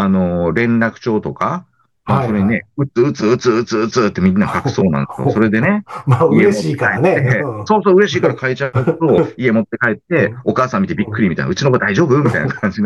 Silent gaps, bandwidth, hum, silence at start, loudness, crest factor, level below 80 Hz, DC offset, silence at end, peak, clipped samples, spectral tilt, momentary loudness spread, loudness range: none; 11.5 kHz; none; 0 s; -15 LUFS; 12 dB; -48 dBFS; under 0.1%; 0 s; -2 dBFS; under 0.1%; -7 dB/octave; 6 LU; 3 LU